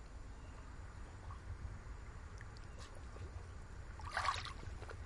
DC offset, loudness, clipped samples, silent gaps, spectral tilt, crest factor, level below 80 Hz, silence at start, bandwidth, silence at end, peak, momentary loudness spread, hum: under 0.1%; -48 LUFS; under 0.1%; none; -4 dB/octave; 24 dB; -52 dBFS; 0 s; 11.5 kHz; 0 s; -24 dBFS; 14 LU; none